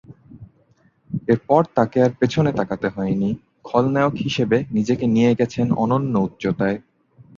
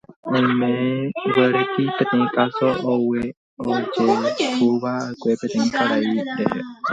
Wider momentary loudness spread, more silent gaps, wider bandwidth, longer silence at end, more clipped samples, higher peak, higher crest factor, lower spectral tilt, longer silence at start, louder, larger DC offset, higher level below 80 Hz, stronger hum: about the same, 7 LU vs 6 LU; second, none vs 0.16-0.23 s, 3.37-3.57 s; about the same, 7.4 kHz vs 8 kHz; first, 0.6 s vs 0 s; neither; about the same, -2 dBFS vs -2 dBFS; about the same, 18 dB vs 18 dB; first, -7.5 dB/octave vs -6 dB/octave; about the same, 0.1 s vs 0.1 s; about the same, -20 LUFS vs -21 LUFS; neither; first, -52 dBFS vs -60 dBFS; neither